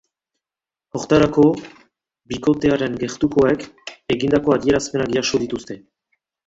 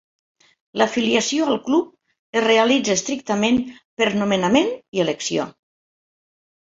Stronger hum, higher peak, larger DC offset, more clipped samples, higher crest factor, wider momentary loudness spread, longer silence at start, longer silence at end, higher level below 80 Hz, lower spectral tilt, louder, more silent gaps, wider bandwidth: neither; about the same, -2 dBFS vs -2 dBFS; neither; neither; about the same, 18 dB vs 20 dB; first, 15 LU vs 9 LU; first, 0.95 s vs 0.75 s; second, 0.7 s vs 1.25 s; first, -48 dBFS vs -60 dBFS; first, -5.5 dB/octave vs -3.5 dB/octave; about the same, -19 LUFS vs -20 LUFS; second, none vs 2.19-2.33 s, 3.85-3.97 s, 4.88-4.92 s; about the same, 8 kHz vs 8 kHz